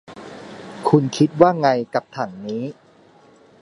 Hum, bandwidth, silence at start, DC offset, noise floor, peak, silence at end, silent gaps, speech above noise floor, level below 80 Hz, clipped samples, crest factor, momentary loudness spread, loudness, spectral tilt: none; 11.5 kHz; 0.1 s; under 0.1%; -51 dBFS; 0 dBFS; 0.9 s; none; 33 dB; -62 dBFS; under 0.1%; 20 dB; 22 LU; -19 LUFS; -7 dB/octave